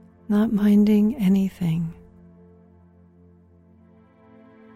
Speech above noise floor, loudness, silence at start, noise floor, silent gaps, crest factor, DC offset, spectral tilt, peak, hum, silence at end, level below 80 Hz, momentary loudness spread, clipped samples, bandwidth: 34 dB; -21 LUFS; 0.3 s; -53 dBFS; none; 14 dB; under 0.1%; -8.5 dB/octave; -8 dBFS; none; 2.8 s; -52 dBFS; 9 LU; under 0.1%; 14 kHz